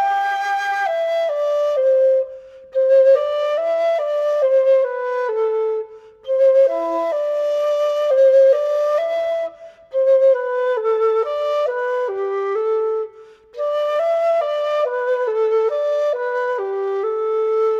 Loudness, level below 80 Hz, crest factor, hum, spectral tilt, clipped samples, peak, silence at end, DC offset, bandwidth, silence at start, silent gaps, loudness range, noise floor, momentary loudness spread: -18 LUFS; -68 dBFS; 12 dB; none; -2.5 dB/octave; under 0.1%; -6 dBFS; 0 s; under 0.1%; 7.4 kHz; 0 s; none; 4 LU; -43 dBFS; 9 LU